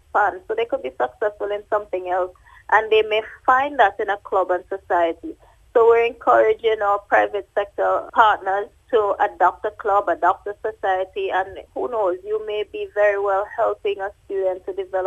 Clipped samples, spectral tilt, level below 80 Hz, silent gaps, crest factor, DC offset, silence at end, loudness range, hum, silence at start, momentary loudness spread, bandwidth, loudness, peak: under 0.1%; -4.5 dB/octave; -56 dBFS; none; 20 dB; under 0.1%; 0 s; 4 LU; none; 0.15 s; 10 LU; 7.8 kHz; -21 LUFS; 0 dBFS